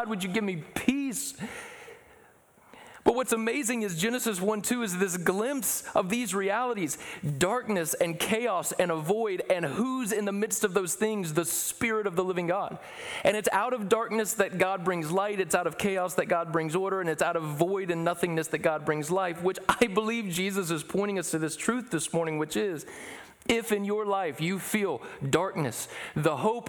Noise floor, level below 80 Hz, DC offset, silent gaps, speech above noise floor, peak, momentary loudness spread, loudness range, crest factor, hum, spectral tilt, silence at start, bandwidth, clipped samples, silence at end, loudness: -59 dBFS; -62 dBFS; under 0.1%; none; 30 dB; -10 dBFS; 5 LU; 2 LU; 20 dB; none; -4 dB/octave; 0 s; over 20 kHz; under 0.1%; 0 s; -29 LUFS